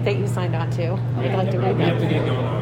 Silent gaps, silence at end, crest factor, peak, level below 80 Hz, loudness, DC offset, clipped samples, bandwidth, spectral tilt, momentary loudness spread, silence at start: none; 0 s; 12 dB; -8 dBFS; -46 dBFS; -22 LUFS; under 0.1%; under 0.1%; 10 kHz; -8 dB/octave; 3 LU; 0 s